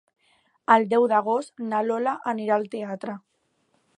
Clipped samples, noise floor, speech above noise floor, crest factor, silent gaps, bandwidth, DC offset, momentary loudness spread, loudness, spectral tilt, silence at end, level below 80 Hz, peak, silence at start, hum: under 0.1%; -69 dBFS; 46 dB; 22 dB; none; 10.5 kHz; under 0.1%; 15 LU; -24 LUFS; -6 dB/octave; 0.8 s; -80 dBFS; -4 dBFS; 0.7 s; none